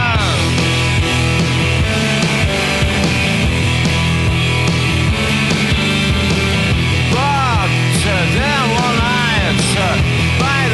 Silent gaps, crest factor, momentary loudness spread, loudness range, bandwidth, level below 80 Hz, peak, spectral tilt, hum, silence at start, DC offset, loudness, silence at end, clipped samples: none; 12 dB; 1 LU; 0 LU; 12 kHz; -26 dBFS; -2 dBFS; -4.5 dB/octave; none; 0 s; under 0.1%; -14 LUFS; 0 s; under 0.1%